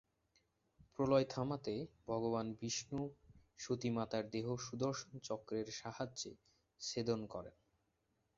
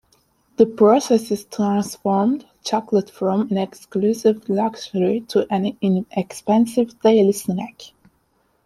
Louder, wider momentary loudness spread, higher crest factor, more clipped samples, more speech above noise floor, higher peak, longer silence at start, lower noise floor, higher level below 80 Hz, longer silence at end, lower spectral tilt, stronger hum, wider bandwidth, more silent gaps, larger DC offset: second, -42 LUFS vs -20 LUFS; about the same, 12 LU vs 11 LU; about the same, 22 dB vs 18 dB; neither; about the same, 42 dB vs 45 dB; second, -20 dBFS vs -2 dBFS; first, 1 s vs 0.6 s; first, -83 dBFS vs -64 dBFS; second, -70 dBFS vs -62 dBFS; about the same, 0.85 s vs 0.8 s; about the same, -5.5 dB/octave vs -6.5 dB/octave; neither; second, 7.6 kHz vs 14.5 kHz; neither; neither